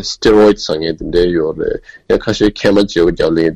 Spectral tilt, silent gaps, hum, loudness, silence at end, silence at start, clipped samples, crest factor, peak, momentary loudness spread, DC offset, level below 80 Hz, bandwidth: -5.5 dB/octave; none; none; -13 LUFS; 0 s; 0 s; under 0.1%; 12 dB; -2 dBFS; 9 LU; under 0.1%; -32 dBFS; 9.8 kHz